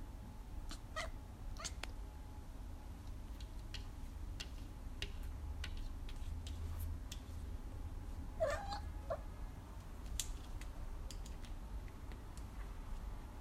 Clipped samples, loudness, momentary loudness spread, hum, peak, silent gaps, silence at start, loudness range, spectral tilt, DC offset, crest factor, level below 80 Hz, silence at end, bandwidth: under 0.1%; -49 LUFS; 8 LU; none; -20 dBFS; none; 0 s; 5 LU; -4.5 dB/octave; under 0.1%; 26 dB; -48 dBFS; 0 s; 16 kHz